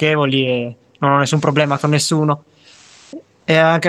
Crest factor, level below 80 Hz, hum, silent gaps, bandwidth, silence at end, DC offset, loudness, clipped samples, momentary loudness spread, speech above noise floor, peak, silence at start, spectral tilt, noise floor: 16 dB; -62 dBFS; none; none; 13.5 kHz; 0 s; under 0.1%; -16 LUFS; under 0.1%; 14 LU; 31 dB; 0 dBFS; 0 s; -5 dB/octave; -46 dBFS